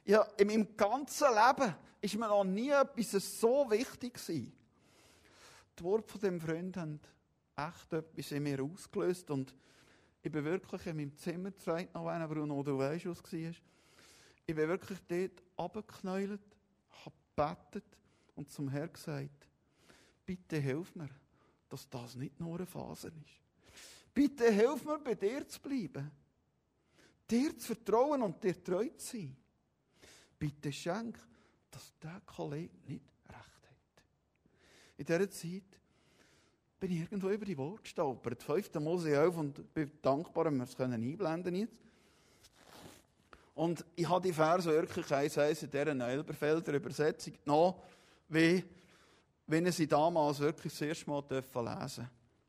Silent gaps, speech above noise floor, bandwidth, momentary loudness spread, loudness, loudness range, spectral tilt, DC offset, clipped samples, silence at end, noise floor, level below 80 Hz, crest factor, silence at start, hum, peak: none; 42 dB; 15.5 kHz; 18 LU; -36 LUFS; 11 LU; -6 dB/octave; under 0.1%; under 0.1%; 0.4 s; -77 dBFS; -72 dBFS; 22 dB; 0.05 s; none; -14 dBFS